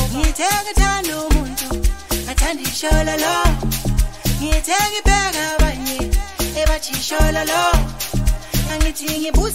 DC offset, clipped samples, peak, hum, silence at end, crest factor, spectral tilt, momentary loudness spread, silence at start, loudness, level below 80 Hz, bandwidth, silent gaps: 1%; under 0.1%; 0 dBFS; none; 0 s; 16 dB; -3.5 dB/octave; 6 LU; 0 s; -19 LUFS; -20 dBFS; 16.5 kHz; none